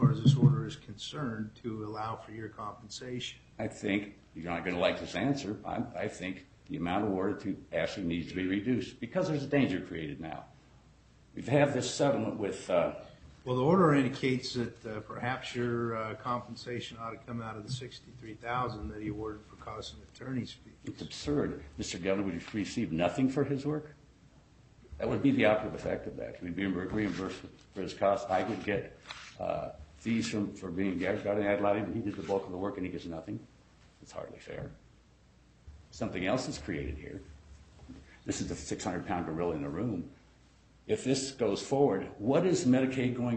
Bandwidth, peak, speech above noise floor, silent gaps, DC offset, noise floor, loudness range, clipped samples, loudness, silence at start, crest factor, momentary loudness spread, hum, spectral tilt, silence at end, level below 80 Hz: 8.4 kHz; -12 dBFS; 29 dB; none; under 0.1%; -62 dBFS; 8 LU; under 0.1%; -33 LUFS; 0 s; 22 dB; 16 LU; none; -6 dB/octave; 0 s; -58 dBFS